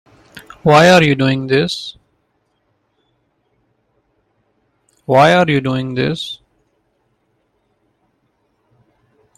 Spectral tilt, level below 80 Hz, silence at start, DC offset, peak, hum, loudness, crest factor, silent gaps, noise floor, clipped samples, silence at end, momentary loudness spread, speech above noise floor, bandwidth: -5.5 dB/octave; -52 dBFS; 0.35 s; under 0.1%; 0 dBFS; none; -13 LUFS; 18 dB; none; -65 dBFS; under 0.1%; 3.05 s; 18 LU; 52 dB; 15.5 kHz